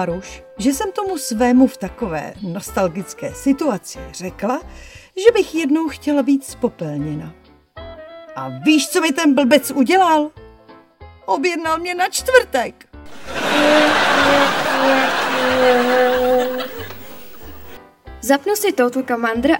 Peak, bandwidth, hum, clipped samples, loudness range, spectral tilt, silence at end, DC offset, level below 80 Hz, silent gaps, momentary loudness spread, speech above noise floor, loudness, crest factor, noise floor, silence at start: 0 dBFS; 17 kHz; none; under 0.1%; 6 LU; -4 dB/octave; 0 s; under 0.1%; -46 dBFS; none; 18 LU; 28 dB; -17 LUFS; 18 dB; -45 dBFS; 0 s